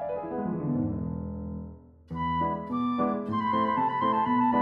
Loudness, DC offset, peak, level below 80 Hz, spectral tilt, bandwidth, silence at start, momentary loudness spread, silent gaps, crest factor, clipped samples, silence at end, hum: -29 LUFS; under 0.1%; -14 dBFS; -50 dBFS; -9.5 dB/octave; 5.2 kHz; 0 s; 12 LU; none; 14 dB; under 0.1%; 0 s; none